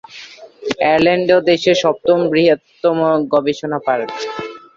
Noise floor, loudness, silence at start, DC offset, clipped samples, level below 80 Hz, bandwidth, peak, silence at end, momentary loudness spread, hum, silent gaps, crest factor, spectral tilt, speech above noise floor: -37 dBFS; -15 LUFS; 0.1 s; under 0.1%; under 0.1%; -56 dBFS; 7.6 kHz; 0 dBFS; 0.2 s; 12 LU; none; none; 14 dB; -5.5 dB/octave; 23 dB